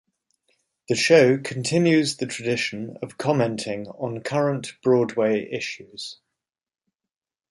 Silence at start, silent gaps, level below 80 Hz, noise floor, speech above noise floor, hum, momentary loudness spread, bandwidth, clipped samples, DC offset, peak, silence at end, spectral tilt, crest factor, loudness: 0.9 s; none; -66 dBFS; -89 dBFS; 66 dB; none; 16 LU; 11.5 kHz; under 0.1%; under 0.1%; -4 dBFS; 1.35 s; -5 dB/octave; 20 dB; -22 LUFS